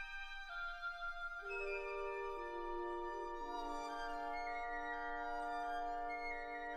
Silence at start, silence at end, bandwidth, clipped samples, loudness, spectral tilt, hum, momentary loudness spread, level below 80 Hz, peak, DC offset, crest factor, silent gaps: 0 s; 0 s; 12.5 kHz; under 0.1%; -44 LUFS; -3.5 dB/octave; none; 3 LU; -56 dBFS; -32 dBFS; under 0.1%; 12 dB; none